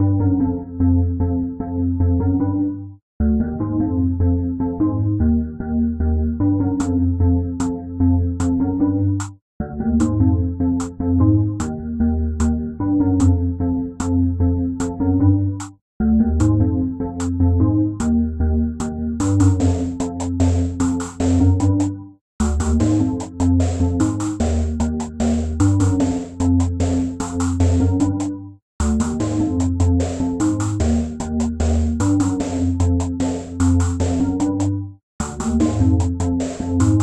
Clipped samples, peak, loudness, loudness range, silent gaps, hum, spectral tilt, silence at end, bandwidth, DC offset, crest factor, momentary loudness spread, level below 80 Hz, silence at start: under 0.1%; -4 dBFS; -19 LUFS; 1 LU; 3.02-3.20 s, 9.42-9.60 s, 15.81-16.00 s, 22.21-22.39 s, 28.62-28.79 s, 35.03-35.19 s; none; -7.5 dB/octave; 0 s; 10 kHz; under 0.1%; 14 dB; 7 LU; -32 dBFS; 0 s